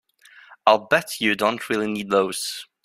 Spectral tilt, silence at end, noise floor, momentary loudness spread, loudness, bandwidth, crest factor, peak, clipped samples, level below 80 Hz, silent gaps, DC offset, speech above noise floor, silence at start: -3.5 dB/octave; 0.2 s; -50 dBFS; 6 LU; -22 LUFS; 16 kHz; 22 dB; -2 dBFS; under 0.1%; -66 dBFS; none; under 0.1%; 29 dB; 0.5 s